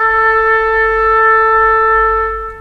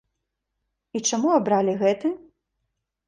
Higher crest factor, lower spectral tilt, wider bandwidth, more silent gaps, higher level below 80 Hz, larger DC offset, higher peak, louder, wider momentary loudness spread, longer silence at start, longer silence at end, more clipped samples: second, 12 dB vs 18 dB; about the same, -4.5 dB/octave vs -4 dB/octave; second, 6 kHz vs 10.5 kHz; neither; first, -32 dBFS vs -68 dBFS; first, 0.2% vs under 0.1%; first, 0 dBFS vs -8 dBFS; first, -10 LUFS vs -22 LUFS; second, 4 LU vs 11 LU; second, 0 s vs 0.95 s; second, 0 s vs 0.9 s; neither